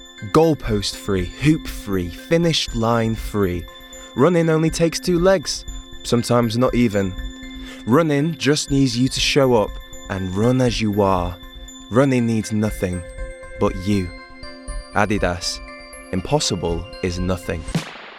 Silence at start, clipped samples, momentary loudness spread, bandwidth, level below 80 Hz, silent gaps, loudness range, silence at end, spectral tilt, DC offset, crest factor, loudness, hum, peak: 0 s; under 0.1%; 17 LU; 17 kHz; -36 dBFS; none; 5 LU; 0 s; -5.5 dB/octave; under 0.1%; 18 dB; -20 LUFS; none; -2 dBFS